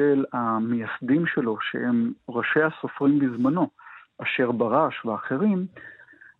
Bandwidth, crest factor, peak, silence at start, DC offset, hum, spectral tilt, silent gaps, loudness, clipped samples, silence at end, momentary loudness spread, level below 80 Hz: 4.1 kHz; 18 dB; -6 dBFS; 0 s; under 0.1%; none; -9.5 dB/octave; none; -24 LUFS; under 0.1%; 0.45 s; 7 LU; -72 dBFS